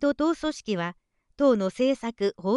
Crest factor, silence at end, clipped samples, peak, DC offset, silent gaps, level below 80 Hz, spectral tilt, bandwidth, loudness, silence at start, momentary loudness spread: 16 dB; 0 s; under 0.1%; -10 dBFS; under 0.1%; none; -58 dBFS; -6 dB/octave; 11.5 kHz; -26 LUFS; 0 s; 7 LU